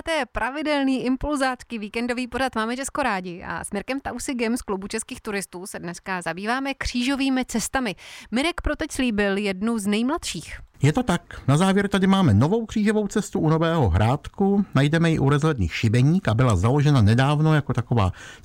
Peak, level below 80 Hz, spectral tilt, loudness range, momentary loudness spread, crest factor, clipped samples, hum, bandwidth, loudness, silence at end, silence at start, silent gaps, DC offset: -8 dBFS; -42 dBFS; -6 dB/octave; 7 LU; 10 LU; 14 dB; under 0.1%; none; 16 kHz; -23 LUFS; 0.1 s; 0.05 s; none; under 0.1%